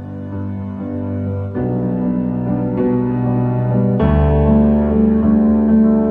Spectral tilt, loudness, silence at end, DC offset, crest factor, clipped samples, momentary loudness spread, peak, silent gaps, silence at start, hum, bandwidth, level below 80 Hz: -12.5 dB/octave; -16 LUFS; 0 s; under 0.1%; 14 dB; under 0.1%; 12 LU; -2 dBFS; none; 0 s; none; 3.5 kHz; -26 dBFS